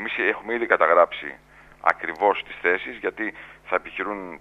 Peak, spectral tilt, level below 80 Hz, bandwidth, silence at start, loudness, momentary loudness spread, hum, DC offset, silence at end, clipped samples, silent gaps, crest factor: 0 dBFS; -5 dB/octave; -60 dBFS; 8.2 kHz; 0 s; -23 LUFS; 13 LU; none; under 0.1%; 0.05 s; under 0.1%; none; 24 dB